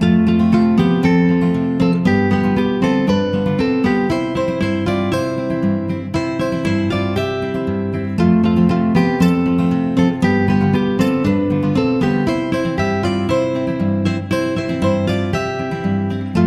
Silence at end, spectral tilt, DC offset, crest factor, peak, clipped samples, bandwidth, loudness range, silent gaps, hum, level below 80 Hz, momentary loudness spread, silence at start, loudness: 0 s; -7.5 dB/octave; under 0.1%; 14 dB; -2 dBFS; under 0.1%; 12 kHz; 4 LU; none; none; -40 dBFS; 6 LU; 0 s; -17 LUFS